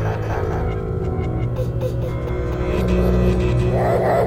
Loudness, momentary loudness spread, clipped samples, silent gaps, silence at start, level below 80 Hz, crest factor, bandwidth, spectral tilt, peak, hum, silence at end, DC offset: -21 LUFS; 6 LU; under 0.1%; none; 0 s; -26 dBFS; 14 dB; 15.5 kHz; -8.5 dB/octave; -6 dBFS; none; 0 s; under 0.1%